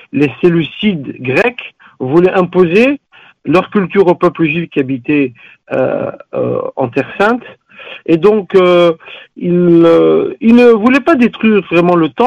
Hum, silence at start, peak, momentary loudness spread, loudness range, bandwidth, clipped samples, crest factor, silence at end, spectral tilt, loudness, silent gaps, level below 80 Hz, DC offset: none; 0.15 s; 0 dBFS; 13 LU; 6 LU; 8 kHz; under 0.1%; 12 dB; 0 s; -8 dB/octave; -11 LUFS; none; -50 dBFS; under 0.1%